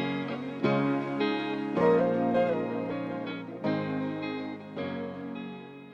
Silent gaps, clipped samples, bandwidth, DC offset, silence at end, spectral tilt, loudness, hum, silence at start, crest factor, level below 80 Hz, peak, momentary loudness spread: none; under 0.1%; 7.4 kHz; under 0.1%; 0 s; -8 dB/octave; -30 LUFS; none; 0 s; 16 dB; -68 dBFS; -12 dBFS; 13 LU